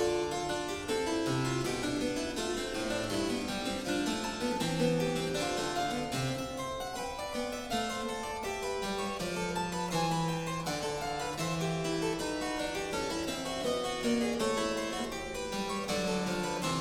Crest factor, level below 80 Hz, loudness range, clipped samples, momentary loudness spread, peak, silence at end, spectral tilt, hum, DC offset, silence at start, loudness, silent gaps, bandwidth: 16 dB; -52 dBFS; 2 LU; under 0.1%; 5 LU; -18 dBFS; 0 s; -4 dB/octave; none; under 0.1%; 0 s; -33 LUFS; none; 17 kHz